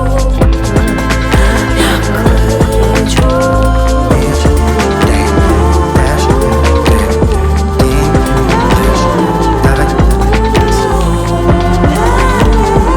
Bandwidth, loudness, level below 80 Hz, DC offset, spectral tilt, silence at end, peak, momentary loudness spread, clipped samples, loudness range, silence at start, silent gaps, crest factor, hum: 17.5 kHz; -10 LUFS; -12 dBFS; under 0.1%; -6 dB/octave; 0 s; 0 dBFS; 2 LU; 0.2%; 0 LU; 0 s; none; 8 dB; none